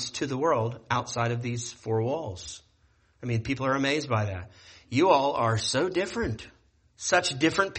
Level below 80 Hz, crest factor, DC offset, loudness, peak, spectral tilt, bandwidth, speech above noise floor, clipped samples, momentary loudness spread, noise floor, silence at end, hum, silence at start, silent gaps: -56 dBFS; 20 dB; under 0.1%; -27 LUFS; -8 dBFS; -4.5 dB/octave; 8.8 kHz; 37 dB; under 0.1%; 15 LU; -65 dBFS; 0 s; none; 0 s; none